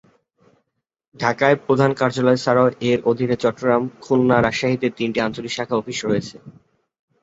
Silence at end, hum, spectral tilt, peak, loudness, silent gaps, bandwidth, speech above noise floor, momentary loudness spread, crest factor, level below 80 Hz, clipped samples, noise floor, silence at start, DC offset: 0.75 s; none; -6 dB/octave; -2 dBFS; -19 LUFS; none; 8 kHz; 55 dB; 7 LU; 18 dB; -54 dBFS; under 0.1%; -74 dBFS; 1.2 s; under 0.1%